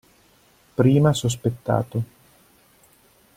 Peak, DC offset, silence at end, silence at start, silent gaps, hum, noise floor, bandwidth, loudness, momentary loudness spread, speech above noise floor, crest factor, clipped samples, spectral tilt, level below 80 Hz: -4 dBFS; under 0.1%; 1.3 s; 0.8 s; none; none; -57 dBFS; 16 kHz; -22 LUFS; 14 LU; 37 dB; 20 dB; under 0.1%; -6.5 dB/octave; -54 dBFS